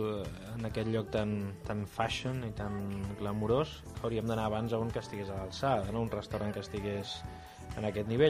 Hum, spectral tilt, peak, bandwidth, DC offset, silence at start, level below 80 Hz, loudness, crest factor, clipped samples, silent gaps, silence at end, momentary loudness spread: none; -6.5 dB/octave; -14 dBFS; 15.5 kHz; under 0.1%; 0 s; -52 dBFS; -36 LUFS; 20 dB; under 0.1%; none; 0 s; 8 LU